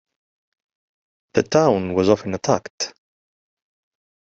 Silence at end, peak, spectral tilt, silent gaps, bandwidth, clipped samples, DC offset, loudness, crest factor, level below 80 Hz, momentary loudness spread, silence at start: 1.45 s; -4 dBFS; -5 dB/octave; 2.70-2.78 s; 8 kHz; under 0.1%; under 0.1%; -20 LUFS; 20 dB; -58 dBFS; 11 LU; 1.35 s